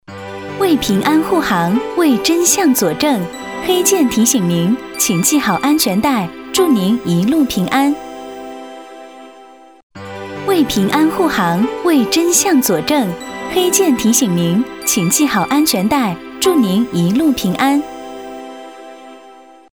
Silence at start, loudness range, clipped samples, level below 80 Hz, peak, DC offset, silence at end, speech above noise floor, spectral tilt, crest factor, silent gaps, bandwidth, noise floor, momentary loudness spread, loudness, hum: 0.1 s; 5 LU; under 0.1%; -48 dBFS; 0 dBFS; 0.2%; 0.4 s; 27 dB; -4 dB/octave; 14 dB; 9.83-9.90 s; over 20 kHz; -41 dBFS; 18 LU; -14 LUFS; none